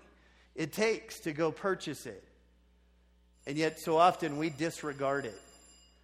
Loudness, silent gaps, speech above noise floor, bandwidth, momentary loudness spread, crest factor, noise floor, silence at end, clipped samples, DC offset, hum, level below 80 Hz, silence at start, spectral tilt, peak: -33 LUFS; none; 33 dB; 15.5 kHz; 20 LU; 22 dB; -65 dBFS; 0.6 s; under 0.1%; under 0.1%; 60 Hz at -65 dBFS; -66 dBFS; 0.55 s; -5 dB/octave; -12 dBFS